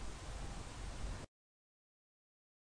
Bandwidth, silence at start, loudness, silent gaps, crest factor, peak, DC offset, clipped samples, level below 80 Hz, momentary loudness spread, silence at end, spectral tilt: 10.5 kHz; 0 s; -49 LUFS; none; 16 dB; -32 dBFS; under 0.1%; under 0.1%; -52 dBFS; 4 LU; 1.5 s; -4.5 dB/octave